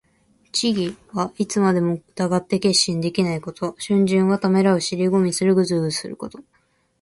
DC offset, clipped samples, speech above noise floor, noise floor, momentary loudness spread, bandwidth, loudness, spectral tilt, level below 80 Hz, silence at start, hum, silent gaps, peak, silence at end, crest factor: under 0.1%; under 0.1%; 44 dB; -64 dBFS; 9 LU; 11.5 kHz; -20 LUFS; -5 dB/octave; -60 dBFS; 0.55 s; none; none; -4 dBFS; 0.6 s; 16 dB